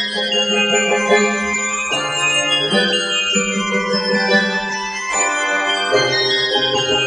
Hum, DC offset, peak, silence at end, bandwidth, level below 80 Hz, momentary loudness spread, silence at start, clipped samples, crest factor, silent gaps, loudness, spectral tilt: none; under 0.1%; -2 dBFS; 0 s; 11.5 kHz; -52 dBFS; 4 LU; 0 s; under 0.1%; 16 dB; none; -16 LUFS; -2 dB/octave